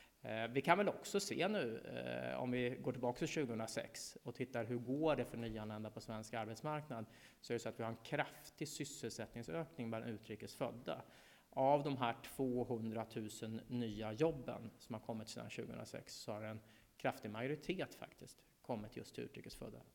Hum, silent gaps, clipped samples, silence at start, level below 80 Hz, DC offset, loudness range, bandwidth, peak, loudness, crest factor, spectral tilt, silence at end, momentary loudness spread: none; none; under 0.1%; 0 s; -70 dBFS; under 0.1%; 6 LU; 19 kHz; -16 dBFS; -43 LUFS; 26 dB; -5 dB/octave; 0.05 s; 12 LU